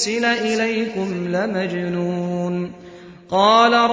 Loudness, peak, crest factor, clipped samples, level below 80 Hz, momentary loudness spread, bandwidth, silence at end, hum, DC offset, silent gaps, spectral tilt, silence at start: -19 LUFS; -2 dBFS; 18 dB; under 0.1%; -58 dBFS; 11 LU; 8 kHz; 0 s; none; under 0.1%; none; -4.5 dB/octave; 0 s